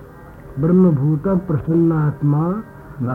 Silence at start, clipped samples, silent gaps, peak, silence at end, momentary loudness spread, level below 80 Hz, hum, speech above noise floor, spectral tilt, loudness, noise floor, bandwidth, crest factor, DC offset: 0 s; under 0.1%; none; -4 dBFS; 0 s; 13 LU; -44 dBFS; none; 22 dB; -12 dB/octave; -17 LUFS; -38 dBFS; 2.6 kHz; 14 dB; under 0.1%